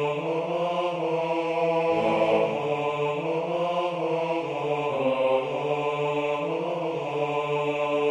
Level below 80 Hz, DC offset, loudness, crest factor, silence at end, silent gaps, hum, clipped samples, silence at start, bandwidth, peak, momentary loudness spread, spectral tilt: -68 dBFS; under 0.1%; -26 LUFS; 16 dB; 0 s; none; none; under 0.1%; 0 s; 9.8 kHz; -10 dBFS; 5 LU; -6.5 dB/octave